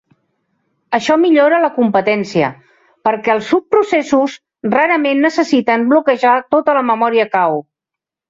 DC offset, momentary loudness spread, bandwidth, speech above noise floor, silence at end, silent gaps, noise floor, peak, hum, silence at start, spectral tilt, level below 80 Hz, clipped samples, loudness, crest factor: under 0.1%; 7 LU; 7.8 kHz; 71 dB; 0.7 s; none; -84 dBFS; -2 dBFS; none; 0.9 s; -5.5 dB/octave; -60 dBFS; under 0.1%; -14 LUFS; 14 dB